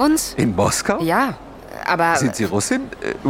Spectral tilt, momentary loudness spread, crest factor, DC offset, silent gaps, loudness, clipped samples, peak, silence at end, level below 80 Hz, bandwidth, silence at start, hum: -4.5 dB/octave; 10 LU; 16 dB; under 0.1%; none; -19 LUFS; under 0.1%; -4 dBFS; 0 s; -44 dBFS; 17 kHz; 0 s; none